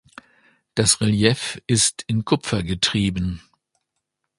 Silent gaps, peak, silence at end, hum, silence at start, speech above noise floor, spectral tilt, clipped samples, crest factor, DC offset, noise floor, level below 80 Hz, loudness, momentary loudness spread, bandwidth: none; 0 dBFS; 1 s; none; 0.75 s; 58 dB; -4 dB/octave; under 0.1%; 22 dB; under 0.1%; -78 dBFS; -44 dBFS; -20 LUFS; 10 LU; 11.5 kHz